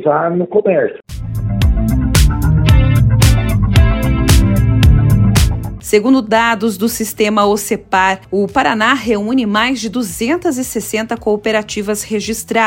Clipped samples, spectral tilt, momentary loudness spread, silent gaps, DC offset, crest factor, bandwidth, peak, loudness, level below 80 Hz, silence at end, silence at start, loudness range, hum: under 0.1%; -5.5 dB/octave; 8 LU; none; under 0.1%; 12 dB; 17 kHz; 0 dBFS; -13 LUFS; -20 dBFS; 0 s; 0 s; 4 LU; none